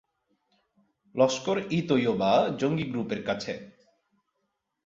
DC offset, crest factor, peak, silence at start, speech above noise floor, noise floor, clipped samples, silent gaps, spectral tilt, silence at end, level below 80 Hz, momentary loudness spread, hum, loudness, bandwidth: under 0.1%; 20 dB; -10 dBFS; 1.15 s; 53 dB; -79 dBFS; under 0.1%; none; -5.5 dB/octave; 1.15 s; -64 dBFS; 10 LU; none; -27 LUFS; 7.8 kHz